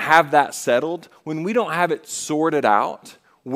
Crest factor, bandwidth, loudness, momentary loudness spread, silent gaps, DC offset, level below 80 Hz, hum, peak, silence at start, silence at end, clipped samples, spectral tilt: 20 dB; 16 kHz; -20 LUFS; 13 LU; none; under 0.1%; -70 dBFS; none; 0 dBFS; 0 s; 0 s; under 0.1%; -4 dB/octave